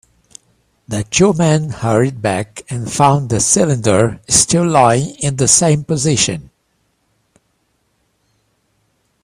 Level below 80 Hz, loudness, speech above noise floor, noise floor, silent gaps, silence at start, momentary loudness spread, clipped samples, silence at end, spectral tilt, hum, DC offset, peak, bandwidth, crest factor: -44 dBFS; -14 LUFS; 50 dB; -63 dBFS; none; 0.9 s; 11 LU; under 0.1%; 2.75 s; -4 dB/octave; none; under 0.1%; 0 dBFS; 15 kHz; 16 dB